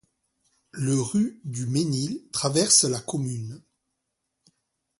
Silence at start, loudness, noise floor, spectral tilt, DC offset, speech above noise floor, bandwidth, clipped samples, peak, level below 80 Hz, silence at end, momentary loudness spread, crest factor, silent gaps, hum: 0.75 s; -24 LUFS; -80 dBFS; -4 dB/octave; under 0.1%; 55 dB; 11.5 kHz; under 0.1%; -4 dBFS; -64 dBFS; 1.4 s; 15 LU; 24 dB; none; none